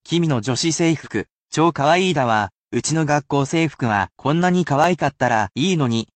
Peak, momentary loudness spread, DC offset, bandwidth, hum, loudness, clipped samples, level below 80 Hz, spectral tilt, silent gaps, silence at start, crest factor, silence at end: -4 dBFS; 5 LU; under 0.1%; 9 kHz; none; -19 LUFS; under 0.1%; -54 dBFS; -5 dB/octave; 1.32-1.46 s, 2.58-2.68 s; 0.1 s; 16 dB; 0.1 s